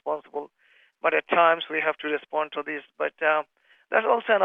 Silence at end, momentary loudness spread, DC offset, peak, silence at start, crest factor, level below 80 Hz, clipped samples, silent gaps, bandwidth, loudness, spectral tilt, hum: 0 s; 15 LU; under 0.1%; -6 dBFS; 0.05 s; 20 dB; -86 dBFS; under 0.1%; none; 3.9 kHz; -25 LUFS; -6 dB/octave; none